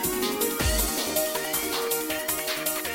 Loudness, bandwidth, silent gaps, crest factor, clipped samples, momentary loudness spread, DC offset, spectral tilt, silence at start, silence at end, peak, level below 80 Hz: -26 LUFS; 17 kHz; none; 16 dB; under 0.1%; 3 LU; under 0.1%; -2.5 dB/octave; 0 s; 0 s; -12 dBFS; -38 dBFS